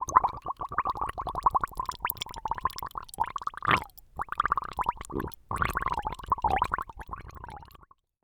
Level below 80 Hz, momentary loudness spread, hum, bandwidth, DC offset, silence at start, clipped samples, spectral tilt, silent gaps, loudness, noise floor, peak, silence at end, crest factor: -46 dBFS; 15 LU; none; over 20 kHz; under 0.1%; 0 s; under 0.1%; -4 dB/octave; none; -31 LUFS; -58 dBFS; -2 dBFS; 0.6 s; 28 dB